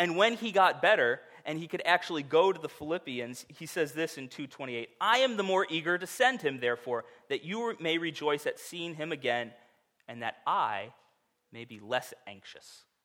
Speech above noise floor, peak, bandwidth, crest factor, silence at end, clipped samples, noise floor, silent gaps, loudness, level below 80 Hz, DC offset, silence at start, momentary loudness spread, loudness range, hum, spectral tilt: 41 dB; -10 dBFS; 17 kHz; 22 dB; 0.25 s; under 0.1%; -72 dBFS; none; -30 LUFS; -80 dBFS; under 0.1%; 0 s; 18 LU; 7 LU; none; -3.5 dB/octave